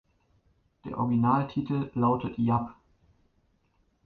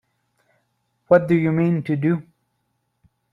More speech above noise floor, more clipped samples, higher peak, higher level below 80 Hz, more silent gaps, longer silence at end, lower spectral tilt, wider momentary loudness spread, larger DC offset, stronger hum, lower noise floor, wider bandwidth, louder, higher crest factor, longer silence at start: second, 43 dB vs 54 dB; neither; second, -10 dBFS vs -2 dBFS; about the same, -58 dBFS vs -62 dBFS; neither; first, 1.35 s vs 1.1 s; about the same, -11 dB/octave vs -10 dB/octave; first, 14 LU vs 6 LU; neither; neither; about the same, -70 dBFS vs -72 dBFS; about the same, 4.8 kHz vs 4.8 kHz; second, -28 LUFS vs -20 LUFS; about the same, 20 dB vs 20 dB; second, 0.85 s vs 1.1 s